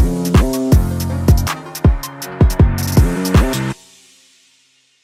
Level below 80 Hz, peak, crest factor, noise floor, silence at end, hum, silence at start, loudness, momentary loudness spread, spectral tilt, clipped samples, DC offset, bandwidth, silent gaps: -20 dBFS; -2 dBFS; 14 dB; -56 dBFS; 1.3 s; none; 0 s; -15 LUFS; 9 LU; -6.5 dB/octave; under 0.1%; under 0.1%; 16.5 kHz; none